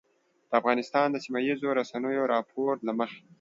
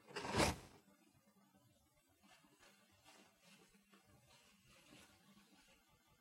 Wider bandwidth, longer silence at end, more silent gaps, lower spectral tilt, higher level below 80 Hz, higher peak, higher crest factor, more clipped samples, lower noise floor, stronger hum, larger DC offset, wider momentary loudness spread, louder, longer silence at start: second, 7.8 kHz vs 16 kHz; second, 0.2 s vs 1.2 s; neither; first, -5.5 dB/octave vs -3.5 dB/octave; second, -80 dBFS vs -66 dBFS; first, -8 dBFS vs -20 dBFS; second, 20 dB vs 30 dB; neither; second, -53 dBFS vs -76 dBFS; neither; neither; second, 5 LU vs 30 LU; first, -28 LUFS vs -41 LUFS; first, 0.5 s vs 0.1 s